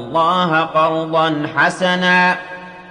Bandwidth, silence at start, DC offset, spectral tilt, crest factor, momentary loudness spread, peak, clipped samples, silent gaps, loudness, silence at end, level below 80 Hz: 10.5 kHz; 0 s; under 0.1%; -5 dB/octave; 14 dB; 8 LU; -4 dBFS; under 0.1%; none; -15 LUFS; 0 s; -58 dBFS